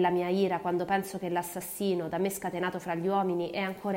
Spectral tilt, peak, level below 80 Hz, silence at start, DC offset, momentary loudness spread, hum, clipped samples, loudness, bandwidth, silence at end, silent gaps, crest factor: -5.5 dB/octave; -14 dBFS; -66 dBFS; 0 s; under 0.1%; 5 LU; none; under 0.1%; -31 LUFS; 16 kHz; 0 s; none; 16 dB